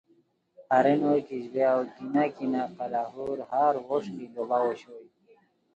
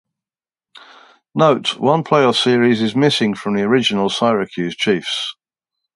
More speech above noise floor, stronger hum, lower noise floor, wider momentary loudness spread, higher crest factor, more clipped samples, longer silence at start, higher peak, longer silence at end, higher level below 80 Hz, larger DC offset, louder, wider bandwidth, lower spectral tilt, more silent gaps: second, 39 dB vs over 74 dB; neither; second, -67 dBFS vs under -90 dBFS; first, 11 LU vs 8 LU; about the same, 20 dB vs 18 dB; neither; second, 0.6 s vs 1.35 s; second, -10 dBFS vs 0 dBFS; about the same, 0.75 s vs 0.65 s; second, -74 dBFS vs -62 dBFS; neither; second, -28 LUFS vs -16 LUFS; second, 8.2 kHz vs 11.5 kHz; first, -7.5 dB/octave vs -5 dB/octave; neither